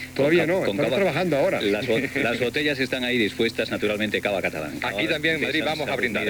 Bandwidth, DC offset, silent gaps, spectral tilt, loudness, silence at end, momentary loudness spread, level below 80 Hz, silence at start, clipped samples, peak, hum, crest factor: over 20 kHz; under 0.1%; none; -5 dB/octave; -23 LUFS; 0 s; 4 LU; -54 dBFS; 0 s; under 0.1%; -8 dBFS; none; 16 dB